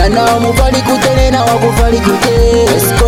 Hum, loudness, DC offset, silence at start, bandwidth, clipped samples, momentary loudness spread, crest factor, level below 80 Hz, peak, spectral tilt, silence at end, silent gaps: none; -10 LUFS; under 0.1%; 0 s; 16.5 kHz; under 0.1%; 2 LU; 8 dB; -16 dBFS; 0 dBFS; -5 dB/octave; 0 s; none